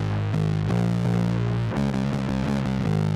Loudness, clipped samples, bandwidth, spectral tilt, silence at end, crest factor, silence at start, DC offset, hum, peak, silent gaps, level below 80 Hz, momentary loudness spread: -24 LUFS; under 0.1%; 11.5 kHz; -8 dB/octave; 0 s; 10 dB; 0 s; under 0.1%; none; -12 dBFS; none; -40 dBFS; 2 LU